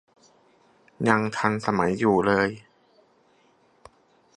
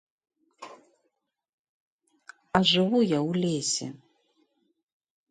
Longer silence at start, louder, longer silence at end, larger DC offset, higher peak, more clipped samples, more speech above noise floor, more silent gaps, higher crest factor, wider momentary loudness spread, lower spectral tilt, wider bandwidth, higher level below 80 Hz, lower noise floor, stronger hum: first, 1 s vs 0.6 s; about the same, -23 LUFS vs -25 LUFS; first, 1.8 s vs 1.35 s; neither; first, -2 dBFS vs -6 dBFS; neither; second, 39 dB vs 54 dB; second, none vs 1.49-1.99 s; about the same, 24 dB vs 24 dB; second, 7 LU vs 25 LU; first, -6.5 dB/octave vs -4 dB/octave; about the same, 11 kHz vs 10.5 kHz; first, -58 dBFS vs -64 dBFS; second, -62 dBFS vs -79 dBFS; neither